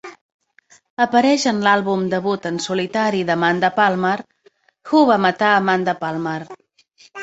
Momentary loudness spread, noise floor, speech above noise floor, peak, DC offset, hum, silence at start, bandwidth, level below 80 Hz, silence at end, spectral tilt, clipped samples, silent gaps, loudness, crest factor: 9 LU; -57 dBFS; 39 dB; -2 dBFS; under 0.1%; none; 0.05 s; 8.2 kHz; -64 dBFS; 0 s; -5 dB/octave; under 0.1%; 0.21-0.39 s, 0.90-0.97 s; -18 LUFS; 18 dB